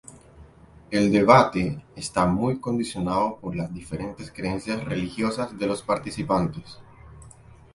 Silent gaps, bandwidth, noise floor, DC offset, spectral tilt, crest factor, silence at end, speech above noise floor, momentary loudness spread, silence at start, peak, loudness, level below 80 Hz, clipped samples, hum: none; 11.5 kHz; -50 dBFS; under 0.1%; -6 dB/octave; 24 dB; 0.45 s; 26 dB; 16 LU; 0.1 s; 0 dBFS; -24 LUFS; -48 dBFS; under 0.1%; none